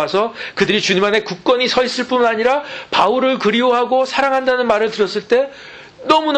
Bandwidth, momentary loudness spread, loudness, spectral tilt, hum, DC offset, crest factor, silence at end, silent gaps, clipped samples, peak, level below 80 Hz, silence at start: 9 kHz; 6 LU; -16 LUFS; -4 dB/octave; none; under 0.1%; 14 dB; 0 s; none; under 0.1%; -2 dBFS; -54 dBFS; 0 s